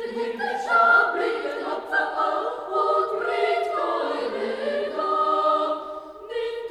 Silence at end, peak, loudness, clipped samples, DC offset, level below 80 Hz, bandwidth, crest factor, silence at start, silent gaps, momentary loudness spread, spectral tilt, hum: 0 s; -8 dBFS; -23 LUFS; under 0.1%; under 0.1%; -66 dBFS; 13 kHz; 16 dB; 0 s; none; 11 LU; -3.5 dB/octave; none